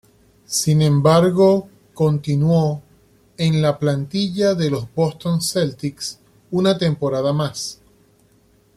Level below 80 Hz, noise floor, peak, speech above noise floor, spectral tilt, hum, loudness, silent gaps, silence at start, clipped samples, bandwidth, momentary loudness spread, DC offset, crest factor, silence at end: -52 dBFS; -56 dBFS; -2 dBFS; 38 dB; -6 dB/octave; none; -19 LUFS; none; 0.5 s; under 0.1%; 14.5 kHz; 11 LU; under 0.1%; 16 dB; 1 s